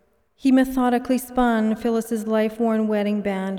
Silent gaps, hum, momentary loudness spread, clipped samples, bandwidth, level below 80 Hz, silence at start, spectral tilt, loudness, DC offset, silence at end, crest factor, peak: none; none; 5 LU; under 0.1%; 17 kHz; -48 dBFS; 0.45 s; -6 dB/octave; -21 LUFS; under 0.1%; 0 s; 14 dB; -8 dBFS